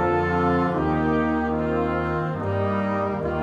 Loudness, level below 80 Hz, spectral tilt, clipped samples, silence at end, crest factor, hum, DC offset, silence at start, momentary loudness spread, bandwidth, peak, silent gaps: -23 LUFS; -42 dBFS; -9 dB/octave; under 0.1%; 0 s; 12 dB; none; under 0.1%; 0 s; 4 LU; 8.8 kHz; -10 dBFS; none